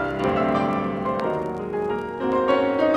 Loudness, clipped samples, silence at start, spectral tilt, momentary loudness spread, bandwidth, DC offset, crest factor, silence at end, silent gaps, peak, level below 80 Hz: -23 LUFS; under 0.1%; 0 s; -7.5 dB/octave; 7 LU; 10.5 kHz; under 0.1%; 16 dB; 0 s; none; -8 dBFS; -48 dBFS